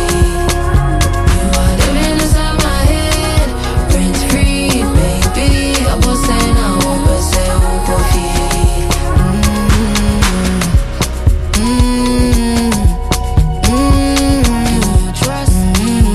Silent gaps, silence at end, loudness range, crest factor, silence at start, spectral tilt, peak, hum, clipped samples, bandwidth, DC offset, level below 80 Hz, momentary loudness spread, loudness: none; 0 s; 1 LU; 10 dB; 0 s; -5 dB/octave; 0 dBFS; none; under 0.1%; 14.5 kHz; under 0.1%; -14 dBFS; 2 LU; -13 LUFS